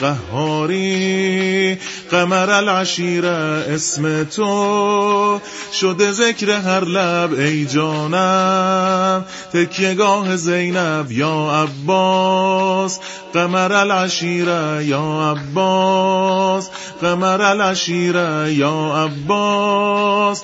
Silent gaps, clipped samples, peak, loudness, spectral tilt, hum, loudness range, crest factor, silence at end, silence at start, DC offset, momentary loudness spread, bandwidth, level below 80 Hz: none; under 0.1%; 0 dBFS; -16 LUFS; -4.5 dB/octave; none; 1 LU; 16 dB; 0 s; 0 s; under 0.1%; 5 LU; 8 kHz; -58 dBFS